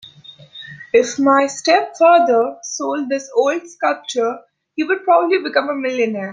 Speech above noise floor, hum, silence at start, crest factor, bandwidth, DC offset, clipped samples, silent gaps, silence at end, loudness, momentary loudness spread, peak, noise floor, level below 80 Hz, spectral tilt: 26 dB; none; 0.05 s; 16 dB; 9.6 kHz; under 0.1%; under 0.1%; none; 0 s; -17 LUFS; 14 LU; 0 dBFS; -42 dBFS; -68 dBFS; -3 dB/octave